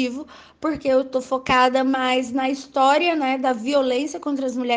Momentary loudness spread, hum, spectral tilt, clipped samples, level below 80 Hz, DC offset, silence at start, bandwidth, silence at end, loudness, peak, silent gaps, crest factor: 9 LU; none; -3.5 dB/octave; under 0.1%; -56 dBFS; under 0.1%; 0 s; 9.6 kHz; 0 s; -21 LUFS; -4 dBFS; none; 16 dB